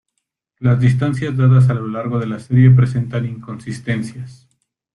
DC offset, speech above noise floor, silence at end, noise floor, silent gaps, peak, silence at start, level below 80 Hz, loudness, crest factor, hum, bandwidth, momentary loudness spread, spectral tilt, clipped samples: under 0.1%; 59 dB; 0.6 s; -74 dBFS; none; -2 dBFS; 0.6 s; -50 dBFS; -16 LUFS; 14 dB; none; 10 kHz; 17 LU; -8.5 dB/octave; under 0.1%